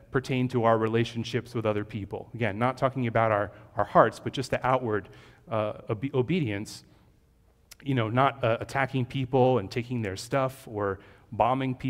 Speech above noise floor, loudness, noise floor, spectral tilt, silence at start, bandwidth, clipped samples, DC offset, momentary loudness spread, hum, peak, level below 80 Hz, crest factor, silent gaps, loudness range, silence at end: 35 dB; -28 LUFS; -62 dBFS; -6.5 dB/octave; 0.1 s; 15.5 kHz; under 0.1%; under 0.1%; 10 LU; none; -4 dBFS; -56 dBFS; 24 dB; none; 4 LU; 0 s